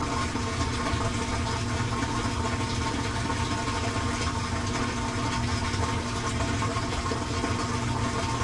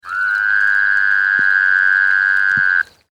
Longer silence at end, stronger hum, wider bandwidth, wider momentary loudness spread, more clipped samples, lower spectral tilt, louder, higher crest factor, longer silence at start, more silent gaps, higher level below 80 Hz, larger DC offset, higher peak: second, 0 s vs 0.3 s; neither; about the same, 11.5 kHz vs 11 kHz; second, 1 LU vs 4 LU; neither; first, -4.5 dB/octave vs -2 dB/octave; second, -28 LUFS vs -13 LUFS; about the same, 14 dB vs 12 dB; about the same, 0 s vs 0.05 s; neither; first, -40 dBFS vs -60 dBFS; neither; second, -14 dBFS vs -4 dBFS